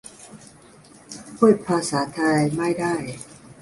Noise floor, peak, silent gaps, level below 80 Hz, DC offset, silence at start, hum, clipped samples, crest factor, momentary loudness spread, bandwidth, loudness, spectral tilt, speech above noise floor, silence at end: -49 dBFS; -4 dBFS; none; -60 dBFS; under 0.1%; 0.05 s; none; under 0.1%; 20 dB; 23 LU; 11.5 kHz; -21 LUFS; -5.5 dB/octave; 28 dB; 0.1 s